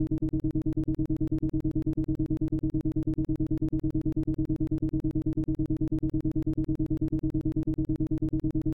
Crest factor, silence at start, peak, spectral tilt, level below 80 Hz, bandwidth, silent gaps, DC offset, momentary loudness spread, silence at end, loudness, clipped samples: 10 dB; 0 s; -18 dBFS; -11.5 dB/octave; -36 dBFS; 3.5 kHz; none; 0.2%; 1 LU; 0.05 s; -30 LUFS; under 0.1%